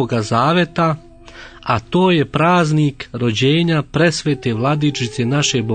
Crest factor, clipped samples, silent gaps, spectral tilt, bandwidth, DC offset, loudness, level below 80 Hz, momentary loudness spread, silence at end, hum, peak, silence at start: 16 dB; under 0.1%; none; -5.5 dB/octave; 9.4 kHz; under 0.1%; -16 LUFS; -46 dBFS; 6 LU; 0 s; none; -2 dBFS; 0 s